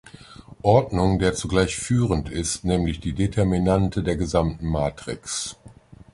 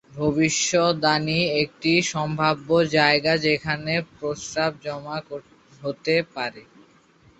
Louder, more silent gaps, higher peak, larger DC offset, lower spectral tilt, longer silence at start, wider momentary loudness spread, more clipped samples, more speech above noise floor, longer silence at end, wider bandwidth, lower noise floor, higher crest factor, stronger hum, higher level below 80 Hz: about the same, -23 LUFS vs -22 LUFS; neither; about the same, -4 dBFS vs -2 dBFS; neither; first, -5.5 dB/octave vs -4 dB/octave; about the same, 0.05 s vs 0.1 s; second, 8 LU vs 14 LU; neither; second, 25 dB vs 33 dB; second, 0.4 s vs 0.75 s; first, 11.5 kHz vs 8.2 kHz; second, -47 dBFS vs -56 dBFS; about the same, 20 dB vs 20 dB; neither; first, -36 dBFS vs -56 dBFS